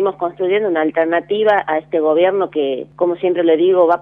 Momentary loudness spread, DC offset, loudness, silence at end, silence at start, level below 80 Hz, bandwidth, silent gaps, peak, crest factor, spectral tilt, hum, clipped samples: 7 LU; under 0.1%; -16 LUFS; 0 s; 0 s; -62 dBFS; 4 kHz; none; -2 dBFS; 14 dB; -8 dB/octave; 50 Hz at -45 dBFS; under 0.1%